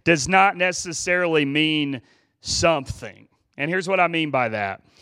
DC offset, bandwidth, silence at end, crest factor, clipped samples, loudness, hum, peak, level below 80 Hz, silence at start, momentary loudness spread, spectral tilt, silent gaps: under 0.1%; 13.5 kHz; 0.25 s; 20 dB; under 0.1%; -21 LUFS; none; -2 dBFS; -50 dBFS; 0.05 s; 16 LU; -3.5 dB/octave; none